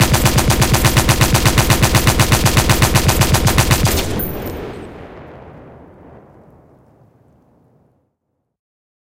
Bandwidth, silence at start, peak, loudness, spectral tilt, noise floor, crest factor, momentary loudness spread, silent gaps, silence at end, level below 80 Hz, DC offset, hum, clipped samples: 17.5 kHz; 0 s; 0 dBFS; -13 LUFS; -4 dB/octave; -71 dBFS; 16 dB; 16 LU; none; 3.4 s; -24 dBFS; under 0.1%; none; under 0.1%